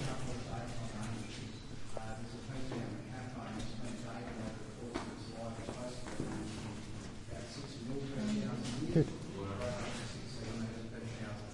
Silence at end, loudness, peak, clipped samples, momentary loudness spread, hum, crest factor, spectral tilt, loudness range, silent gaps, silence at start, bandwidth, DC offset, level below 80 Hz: 0 s; -42 LUFS; -18 dBFS; under 0.1%; 8 LU; none; 22 dB; -6 dB/octave; 6 LU; none; 0 s; 11.5 kHz; under 0.1%; -54 dBFS